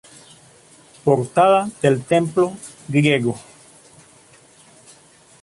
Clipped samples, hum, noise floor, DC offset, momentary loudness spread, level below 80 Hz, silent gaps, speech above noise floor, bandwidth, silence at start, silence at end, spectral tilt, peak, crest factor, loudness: under 0.1%; none; -50 dBFS; under 0.1%; 10 LU; -60 dBFS; none; 32 dB; 11.5 kHz; 1.05 s; 2 s; -6 dB/octave; -2 dBFS; 18 dB; -18 LUFS